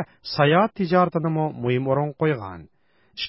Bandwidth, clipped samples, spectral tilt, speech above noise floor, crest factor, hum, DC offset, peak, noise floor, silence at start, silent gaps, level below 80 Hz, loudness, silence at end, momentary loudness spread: 5.8 kHz; under 0.1%; -10.5 dB/octave; 19 dB; 18 dB; none; under 0.1%; -6 dBFS; -41 dBFS; 0 s; none; -58 dBFS; -22 LUFS; 0 s; 11 LU